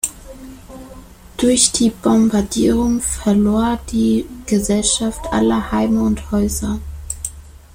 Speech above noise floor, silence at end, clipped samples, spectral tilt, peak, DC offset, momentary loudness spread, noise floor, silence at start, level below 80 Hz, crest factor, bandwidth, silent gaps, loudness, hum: 23 dB; 0.15 s; under 0.1%; -4 dB/octave; 0 dBFS; under 0.1%; 21 LU; -39 dBFS; 0.05 s; -34 dBFS; 18 dB; 16.5 kHz; none; -17 LUFS; none